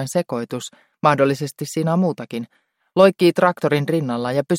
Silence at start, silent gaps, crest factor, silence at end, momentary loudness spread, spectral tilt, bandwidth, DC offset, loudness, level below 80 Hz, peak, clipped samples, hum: 0 s; none; 18 dB; 0 s; 15 LU; -6 dB/octave; 16.5 kHz; under 0.1%; -19 LUFS; -64 dBFS; -2 dBFS; under 0.1%; none